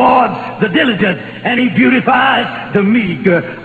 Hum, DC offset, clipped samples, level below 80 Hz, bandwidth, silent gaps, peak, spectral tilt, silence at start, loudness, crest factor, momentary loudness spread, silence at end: none; 0.1%; under 0.1%; -50 dBFS; 4.7 kHz; none; 0 dBFS; -8 dB/octave; 0 s; -12 LUFS; 12 dB; 6 LU; 0 s